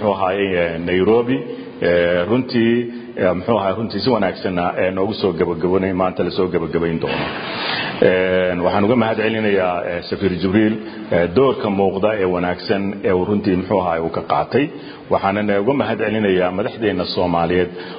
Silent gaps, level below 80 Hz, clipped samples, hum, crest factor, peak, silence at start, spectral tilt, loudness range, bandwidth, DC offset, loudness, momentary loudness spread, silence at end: none; -44 dBFS; under 0.1%; none; 18 dB; 0 dBFS; 0 s; -11.5 dB/octave; 2 LU; 5.2 kHz; under 0.1%; -18 LUFS; 5 LU; 0 s